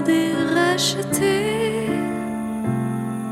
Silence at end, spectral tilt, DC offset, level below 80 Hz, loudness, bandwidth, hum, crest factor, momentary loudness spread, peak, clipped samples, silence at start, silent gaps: 0 s; -4.5 dB/octave; under 0.1%; -52 dBFS; -21 LUFS; 16.5 kHz; none; 16 dB; 7 LU; -6 dBFS; under 0.1%; 0 s; none